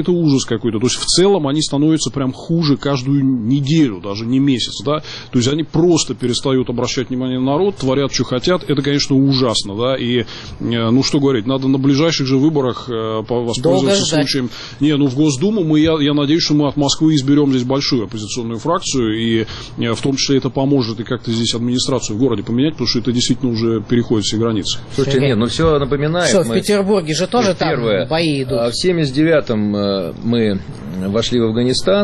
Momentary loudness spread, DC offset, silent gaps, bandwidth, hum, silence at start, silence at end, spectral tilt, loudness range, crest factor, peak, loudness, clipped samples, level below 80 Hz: 6 LU; under 0.1%; none; 11.5 kHz; none; 0 s; 0 s; -5 dB/octave; 2 LU; 12 dB; -2 dBFS; -16 LUFS; under 0.1%; -40 dBFS